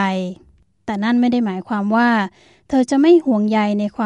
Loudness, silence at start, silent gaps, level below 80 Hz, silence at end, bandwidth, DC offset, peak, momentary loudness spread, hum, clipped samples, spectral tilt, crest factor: -17 LUFS; 0 s; none; -56 dBFS; 0 s; 10.5 kHz; under 0.1%; -2 dBFS; 14 LU; none; under 0.1%; -6.5 dB/octave; 14 dB